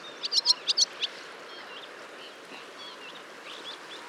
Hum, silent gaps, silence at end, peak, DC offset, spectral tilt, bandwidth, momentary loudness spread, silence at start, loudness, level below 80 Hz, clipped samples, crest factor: none; none; 0 s; -8 dBFS; under 0.1%; 1.5 dB/octave; 17 kHz; 20 LU; 0 s; -26 LUFS; under -90 dBFS; under 0.1%; 24 dB